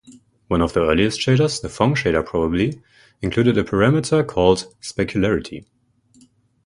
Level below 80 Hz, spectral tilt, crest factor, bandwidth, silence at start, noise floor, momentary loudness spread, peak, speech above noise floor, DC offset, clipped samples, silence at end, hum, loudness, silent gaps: -40 dBFS; -6 dB/octave; 20 dB; 11.5 kHz; 0.1 s; -55 dBFS; 8 LU; 0 dBFS; 37 dB; under 0.1%; under 0.1%; 1.05 s; none; -19 LUFS; none